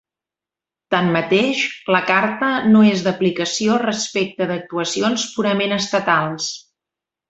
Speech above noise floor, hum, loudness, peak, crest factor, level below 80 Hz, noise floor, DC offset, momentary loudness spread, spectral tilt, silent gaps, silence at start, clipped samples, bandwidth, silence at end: 71 dB; none; -18 LUFS; -2 dBFS; 18 dB; -60 dBFS; -88 dBFS; under 0.1%; 8 LU; -4.5 dB/octave; none; 0.9 s; under 0.1%; 8 kHz; 0.7 s